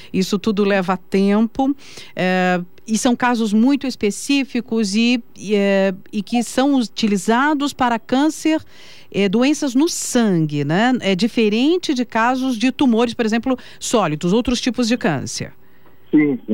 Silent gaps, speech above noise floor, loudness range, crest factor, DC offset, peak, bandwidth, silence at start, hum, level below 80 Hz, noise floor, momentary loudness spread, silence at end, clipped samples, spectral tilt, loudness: none; 34 dB; 1 LU; 12 dB; 1%; -6 dBFS; 16 kHz; 0 s; none; -48 dBFS; -51 dBFS; 6 LU; 0 s; under 0.1%; -5 dB/octave; -18 LUFS